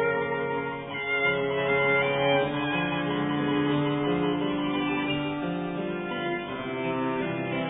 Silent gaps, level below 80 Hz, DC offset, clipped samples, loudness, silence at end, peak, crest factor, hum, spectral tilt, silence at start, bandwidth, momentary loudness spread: none; -58 dBFS; under 0.1%; under 0.1%; -27 LUFS; 0 s; -12 dBFS; 16 dB; none; -10 dB/octave; 0 s; 3.9 kHz; 8 LU